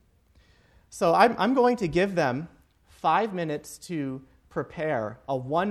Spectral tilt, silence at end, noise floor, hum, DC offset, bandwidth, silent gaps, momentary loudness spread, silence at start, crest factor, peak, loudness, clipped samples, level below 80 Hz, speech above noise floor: -6 dB/octave; 0 s; -61 dBFS; none; under 0.1%; 14.5 kHz; none; 15 LU; 0.9 s; 22 dB; -6 dBFS; -26 LUFS; under 0.1%; -58 dBFS; 36 dB